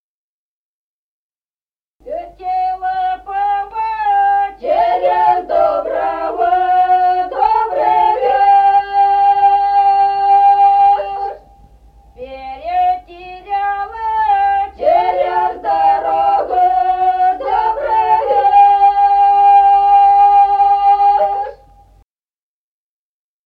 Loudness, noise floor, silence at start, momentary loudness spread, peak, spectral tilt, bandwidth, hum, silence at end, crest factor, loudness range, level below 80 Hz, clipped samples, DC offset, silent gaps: -13 LUFS; under -90 dBFS; 2.05 s; 11 LU; -2 dBFS; -5 dB/octave; 4.9 kHz; none; 1.9 s; 12 dB; 9 LU; -46 dBFS; under 0.1%; under 0.1%; none